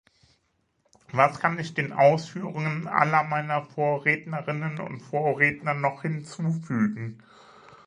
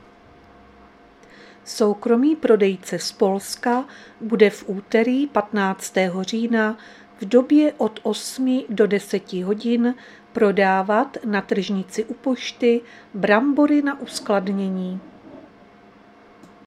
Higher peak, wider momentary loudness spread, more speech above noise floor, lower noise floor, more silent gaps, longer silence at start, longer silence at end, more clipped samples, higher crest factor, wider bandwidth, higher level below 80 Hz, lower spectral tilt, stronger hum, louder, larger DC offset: second, -4 dBFS vs 0 dBFS; about the same, 11 LU vs 11 LU; first, 46 dB vs 29 dB; first, -72 dBFS vs -49 dBFS; neither; second, 1.15 s vs 1.65 s; second, 0.1 s vs 1.25 s; neither; about the same, 24 dB vs 20 dB; second, 10 kHz vs 14.5 kHz; about the same, -68 dBFS vs -66 dBFS; first, -7 dB/octave vs -5.5 dB/octave; neither; second, -25 LUFS vs -21 LUFS; neither